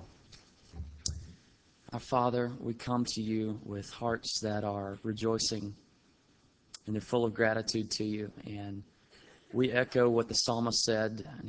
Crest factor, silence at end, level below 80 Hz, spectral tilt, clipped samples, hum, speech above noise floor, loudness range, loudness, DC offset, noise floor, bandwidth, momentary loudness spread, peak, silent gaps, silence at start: 22 dB; 0 s; -56 dBFS; -4 dB/octave; under 0.1%; none; 34 dB; 4 LU; -33 LUFS; under 0.1%; -67 dBFS; 8 kHz; 16 LU; -12 dBFS; none; 0 s